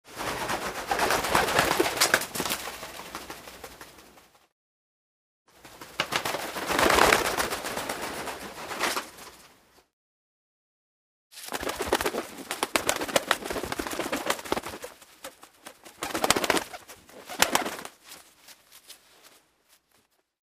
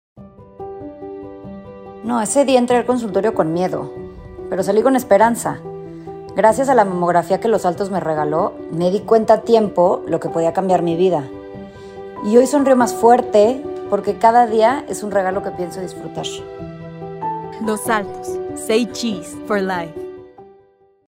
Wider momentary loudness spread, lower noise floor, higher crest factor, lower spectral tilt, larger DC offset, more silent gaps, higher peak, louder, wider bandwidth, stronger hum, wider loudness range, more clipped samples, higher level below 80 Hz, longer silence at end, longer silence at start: first, 23 LU vs 19 LU; first, -68 dBFS vs -53 dBFS; first, 30 dB vs 18 dB; second, -2 dB/octave vs -5.5 dB/octave; neither; first, 4.52-5.45 s, 9.93-11.30 s vs none; about the same, -2 dBFS vs 0 dBFS; second, -27 LUFS vs -17 LUFS; about the same, 16 kHz vs 16 kHz; neither; first, 10 LU vs 7 LU; neither; about the same, -54 dBFS vs -52 dBFS; first, 1.2 s vs 0.65 s; about the same, 0.05 s vs 0.15 s